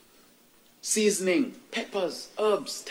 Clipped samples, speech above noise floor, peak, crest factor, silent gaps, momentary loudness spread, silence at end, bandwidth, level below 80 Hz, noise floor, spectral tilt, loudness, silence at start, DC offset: under 0.1%; 32 dB; -12 dBFS; 16 dB; none; 9 LU; 0 s; 16.5 kHz; -76 dBFS; -59 dBFS; -3 dB/octave; -28 LUFS; 0.85 s; under 0.1%